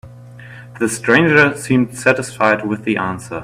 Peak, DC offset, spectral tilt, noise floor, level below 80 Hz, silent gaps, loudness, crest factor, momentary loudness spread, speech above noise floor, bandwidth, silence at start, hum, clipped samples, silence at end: 0 dBFS; under 0.1%; -5 dB/octave; -37 dBFS; -52 dBFS; none; -15 LUFS; 16 dB; 10 LU; 21 dB; 16 kHz; 0.05 s; 60 Hz at -40 dBFS; under 0.1%; 0 s